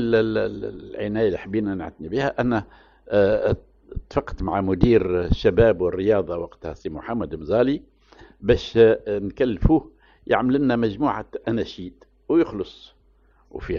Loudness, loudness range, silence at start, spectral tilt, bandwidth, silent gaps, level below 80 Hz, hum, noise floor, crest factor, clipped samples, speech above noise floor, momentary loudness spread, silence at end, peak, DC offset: -22 LUFS; 3 LU; 0 s; -6 dB/octave; 7 kHz; none; -36 dBFS; none; -58 dBFS; 22 dB; under 0.1%; 36 dB; 15 LU; 0 s; 0 dBFS; under 0.1%